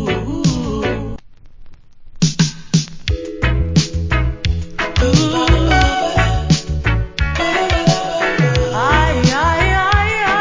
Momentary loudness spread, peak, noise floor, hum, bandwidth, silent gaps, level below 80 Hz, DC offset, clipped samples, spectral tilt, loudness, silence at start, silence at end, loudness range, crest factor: 7 LU; 0 dBFS; -36 dBFS; none; 7.6 kHz; none; -22 dBFS; under 0.1%; under 0.1%; -5 dB/octave; -16 LUFS; 0 s; 0 s; 5 LU; 16 dB